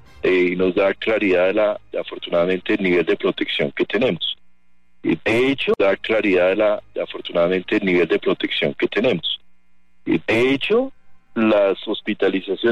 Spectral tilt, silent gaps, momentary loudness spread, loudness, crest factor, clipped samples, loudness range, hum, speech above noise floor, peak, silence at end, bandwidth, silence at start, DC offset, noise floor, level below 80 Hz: -6.5 dB/octave; none; 8 LU; -19 LUFS; 12 dB; under 0.1%; 2 LU; none; 41 dB; -8 dBFS; 0 s; 10 kHz; 0.25 s; 0.6%; -59 dBFS; -54 dBFS